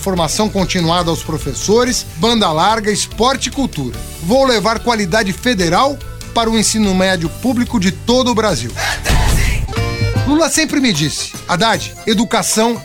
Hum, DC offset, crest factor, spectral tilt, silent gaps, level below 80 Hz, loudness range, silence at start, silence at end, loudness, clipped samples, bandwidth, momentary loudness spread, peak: none; 0.3%; 14 dB; -4 dB/octave; none; -26 dBFS; 1 LU; 0 s; 0 s; -15 LUFS; under 0.1%; 18 kHz; 6 LU; 0 dBFS